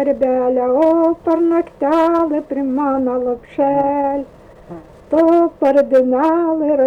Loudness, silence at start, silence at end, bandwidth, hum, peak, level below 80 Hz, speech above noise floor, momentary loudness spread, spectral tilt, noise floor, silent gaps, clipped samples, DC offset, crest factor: -15 LUFS; 0 s; 0 s; 6 kHz; none; -6 dBFS; -50 dBFS; 21 dB; 7 LU; -7.5 dB/octave; -36 dBFS; none; under 0.1%; under 0.1%; 10 dB